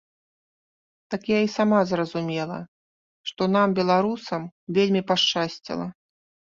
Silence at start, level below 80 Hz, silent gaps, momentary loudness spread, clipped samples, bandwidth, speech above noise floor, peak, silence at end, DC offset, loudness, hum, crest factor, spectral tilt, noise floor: 1.1 s; -66 dBFS; 2.68-3.24 s, 4.52-4.67 s; 13 LU; under 0.1%; 7.4 kHz; over 67 dB; -6 dBFS; 0.65 s; under 0.1%; -24 LUFS; none; 18 dB; -5.5 dB/octave; under -90 dBFS